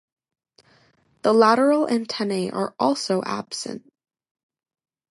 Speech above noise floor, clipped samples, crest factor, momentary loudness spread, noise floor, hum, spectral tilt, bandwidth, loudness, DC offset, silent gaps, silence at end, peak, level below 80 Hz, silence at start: 40 dB; under 0.1%; 20 dB; 14 LU; -61 dBFS; none; -4.5 dB/octave; 11.5 kHz; -21 LUFS; under 0.1%; none; 1.35 s; -4 dBFS; -72 dBFS; 1.25 s